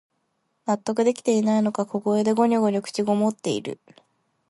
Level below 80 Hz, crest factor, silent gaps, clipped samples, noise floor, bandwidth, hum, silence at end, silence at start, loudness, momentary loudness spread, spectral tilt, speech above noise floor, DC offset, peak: -70 dBFS; 16 dB; none; under 0.1%; -73 dBFS; 11.5 kHz; none; 0.75 s; 0.65 s; -23 LUFS; 9 LU; -6 dB/octave; 50 dB; under 0.1%; -8 dBFS